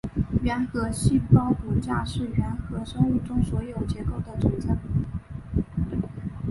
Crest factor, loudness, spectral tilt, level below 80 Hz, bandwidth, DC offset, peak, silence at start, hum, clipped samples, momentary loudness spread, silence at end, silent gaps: 20 dB; -26 LUFS; -7.5 dB/octave; -36 dBFS; 11.5 kHz; under 0.1%; -4 dBFS; 0.05 s; none; under 0.1%; 10 LU; 0 s; none